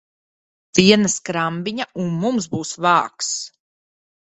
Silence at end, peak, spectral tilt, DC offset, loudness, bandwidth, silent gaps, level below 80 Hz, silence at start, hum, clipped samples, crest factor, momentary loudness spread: 0.75 s; 0 dBFS; -4 dB/octave; under 0.1%; -19 LUFS; 8.4 kHz; none; -58 dBFS; 0.75 s; none; under 0.1%; 20 dB; 12 LU